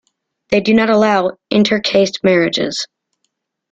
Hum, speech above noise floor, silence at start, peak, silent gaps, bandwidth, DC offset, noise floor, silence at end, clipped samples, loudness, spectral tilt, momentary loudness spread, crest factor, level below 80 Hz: none; 57 dB; 0.5 s; 0 dBFS; none; 8 kHz; under 0.1%; -71 dBFS; 0.85 s; under 0.1%; -14 LUFS; -5 dB/octave; 7 LU; 14 dB; -52 dBFS